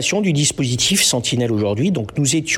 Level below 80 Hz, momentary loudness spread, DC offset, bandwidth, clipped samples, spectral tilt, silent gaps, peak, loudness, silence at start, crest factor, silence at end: -50 dBFS; 5 LU; under 0.1%; 18 kHz; under 0.1%; -3.5 dB/octave; none; -4 dBFS; -17 LUFS; 0 s; 14 dB; 0 s